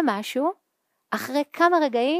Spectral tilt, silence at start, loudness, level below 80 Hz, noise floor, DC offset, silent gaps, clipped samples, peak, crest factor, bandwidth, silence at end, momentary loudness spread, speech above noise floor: -4 dB/octave; 0 s; -24 LUFS; -82 dBFS; -75 dBFS; under 0.1%; none; under 0.1%; -6 dBFS; 18 dB; 15.5 kHz; 0 s; 10 LU; 53 dB